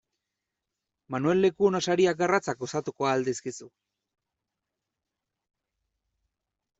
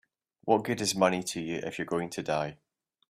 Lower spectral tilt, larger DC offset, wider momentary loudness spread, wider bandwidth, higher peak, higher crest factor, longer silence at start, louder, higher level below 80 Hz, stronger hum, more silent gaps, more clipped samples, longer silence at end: about the same, -5 dB/octave vs -4 dB/octave; neither; first, 12 LU vs 9 LU; second, 8 kHz vs 15.5 kHz; about the same, -10 dBFS vs -8 dBFS; about the same, 20 dB vs 22 dB; first, 1.1 s vs 0.45 s; first, -26 LUFS vs -30 LUFS; about the same, -68 dBFS vs -68 dBFS; neither; neither; neither; first, 3.1 s vs 0.55 s